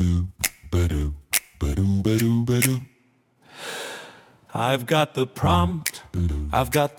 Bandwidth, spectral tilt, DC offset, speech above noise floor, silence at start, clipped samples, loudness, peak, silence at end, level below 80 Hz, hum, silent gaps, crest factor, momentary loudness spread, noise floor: 18 kHz; -5 dB/octave; under 0.1%; 41 dB; 0 s; under 0.1%; -24 LUFS; 0 dBFS; 0.05 s; -38 dBFS; none; none; 24 dB; 12 LU; -62 dBFS